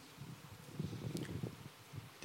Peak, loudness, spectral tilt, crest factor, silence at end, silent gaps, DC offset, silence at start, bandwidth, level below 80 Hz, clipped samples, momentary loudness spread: -24 dBFS; -48 LUFS; -6 dB/octave; 24 dB; 0 s; none; under 0.1%; 0 s; 16.5 kHz; -72 dBFS; under 0.1%; 9 LU